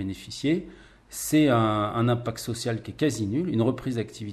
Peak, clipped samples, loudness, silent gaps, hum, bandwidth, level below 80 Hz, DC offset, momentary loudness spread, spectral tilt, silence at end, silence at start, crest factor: -10 dBFS; under 0.1%; -26 LUFS; none; none; 14 kHz; -54 dBFS; under 0.1%; 11 LU; -6 dB/octave; 0 s; 0 s; 16 dB